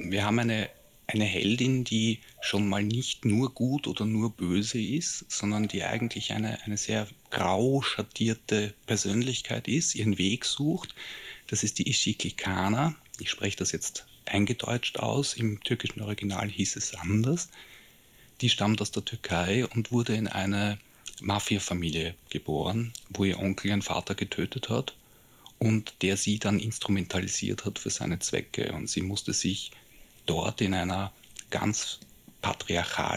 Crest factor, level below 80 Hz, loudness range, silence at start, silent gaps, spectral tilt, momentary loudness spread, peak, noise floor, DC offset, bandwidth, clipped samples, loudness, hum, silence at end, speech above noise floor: 18 dB; -60 dBFS; 3 LU; 0 s; none; -4 dB/octave; 7 LU; -12 dBFS; -57 dBFS; under 0.1%; 15.5 kHz; under 0.1%; -29 LUFS; none; 0 s; 28 dB